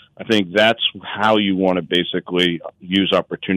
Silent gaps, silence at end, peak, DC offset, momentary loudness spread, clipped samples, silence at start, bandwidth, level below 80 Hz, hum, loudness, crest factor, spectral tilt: none; 0 s; -4 dBFS; under 0.1%; 5 LU; under 0.1%; 0.2 s; 14.5 kHz; -64 dBFS; none; -18 LUFS; 14 dB; -5.5 dB/octave